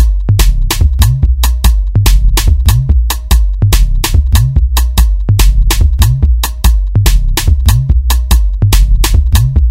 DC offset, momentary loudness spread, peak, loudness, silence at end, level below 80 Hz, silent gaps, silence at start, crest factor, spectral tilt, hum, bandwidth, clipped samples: under 0.1%; 2 LU; 0 dBFS; -11 LUFS; 0 s; -8 dBFS; none; 0 s; 8 dB; -4.5 dB/octave; none; 16.5 kHz; 0.3%